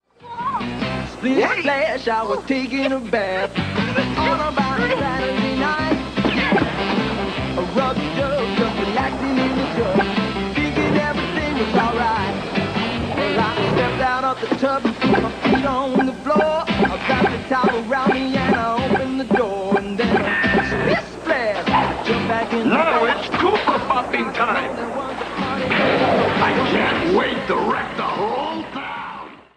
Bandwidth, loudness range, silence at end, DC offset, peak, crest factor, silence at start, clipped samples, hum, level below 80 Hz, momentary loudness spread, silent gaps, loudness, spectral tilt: 10.5 kHz; 2 LU; 0.15 s; under 0.1%; -4 dBFS; 14 dB; 0.2 s; under 0.1%; none; -40 dBFS; 6 LU; none; -20 LUFS; -6 dB/octave